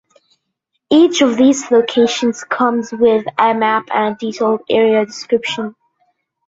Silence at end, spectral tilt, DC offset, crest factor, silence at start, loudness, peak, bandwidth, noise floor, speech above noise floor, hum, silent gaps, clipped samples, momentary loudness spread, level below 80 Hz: 0.75 s; -4 dB/octave; under 0.1%; 14 dB; 0.9 s; -14 LUFS; 0 dBFS; 7.8 kHz; -72 dBFS; 58 dB; none; none; under 0.1%; 7 LU; -60 dBFS